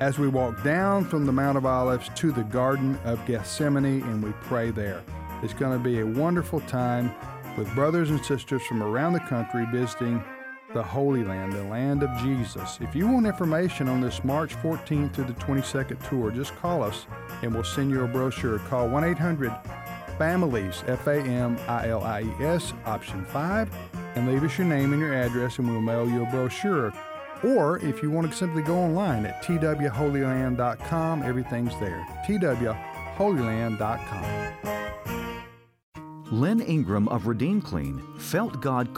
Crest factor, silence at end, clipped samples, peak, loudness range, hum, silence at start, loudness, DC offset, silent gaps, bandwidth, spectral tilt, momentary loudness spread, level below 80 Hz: 14 dB; 0 s; under 0.1%; -12 dBFS; 3 LU; none; 0 s; -27 LUFS; under 0.1%; 35.83-35.92 s; 16 kHz; -7 dB/octave; 9 LU; -48 dBFS